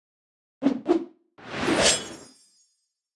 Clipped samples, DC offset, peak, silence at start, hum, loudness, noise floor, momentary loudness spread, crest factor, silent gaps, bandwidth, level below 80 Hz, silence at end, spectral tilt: under 0.1%; under 0.1%; -6 dBFS; 0.6 s; none; -24 LUFS; -74 dBFS; 21 LU; 22 dB; none; 12 kHz; -56 dBFS; 0.9 s; -2.5 dB/octave